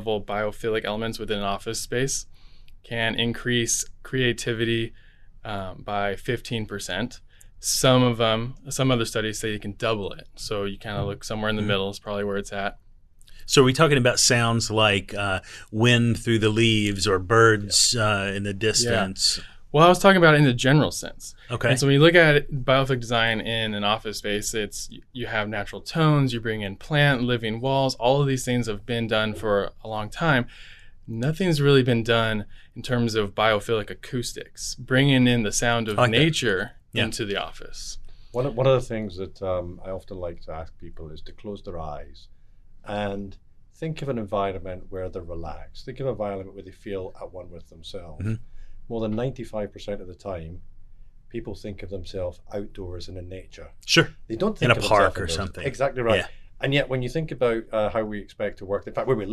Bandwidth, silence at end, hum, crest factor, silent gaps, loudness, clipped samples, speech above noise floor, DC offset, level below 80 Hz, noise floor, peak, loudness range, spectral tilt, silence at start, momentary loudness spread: 13.5 kHz; 0 s; none; 22 dB; none; -23 LUFS; under 0.1%; 24 dB; under 0.1%; -42 dBFS; -47 dBFS; -2 dBFS; 14 LU; -4.5 dB/octave; 0 s; 18 LU